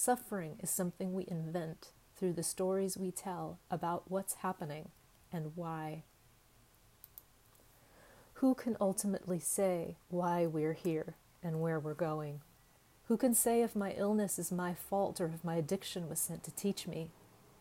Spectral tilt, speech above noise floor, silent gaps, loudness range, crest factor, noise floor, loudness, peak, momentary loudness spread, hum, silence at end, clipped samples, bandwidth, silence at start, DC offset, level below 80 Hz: -5 dB/octave; 29 dB; none; 8 LU; 20 dB; -66 dBFS; -37 LUFS; -18 dBFS; 13 LU; none; 0.5 s; under 0.1%; 16 kHz; 0 s; under 0.1%; -70 dBFS